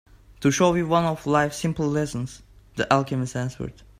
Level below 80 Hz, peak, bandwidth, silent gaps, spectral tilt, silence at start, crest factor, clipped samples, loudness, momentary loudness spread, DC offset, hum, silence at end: -50 dBFS; -2 dBFS; 16 kHz; none; -5.5 dB/octave; 0.4 s; 22 dB; under 0.1%; -24 LUFS; 12 LU; under 0.1%; none; 0.3 s